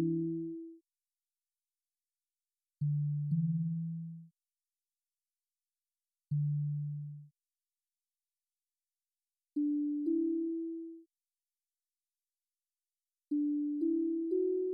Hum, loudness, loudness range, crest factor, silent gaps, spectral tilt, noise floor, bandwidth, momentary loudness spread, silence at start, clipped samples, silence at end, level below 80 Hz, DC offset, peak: none; -35 LUFS; 4 LU; 14 dB; none; -5 dB/octave; under -90 dBFS; 0.8 kHz; 14 LU; 0 s; under 0.1%; 0 s; -88 dBFS; under 0.1%; -24 dBFS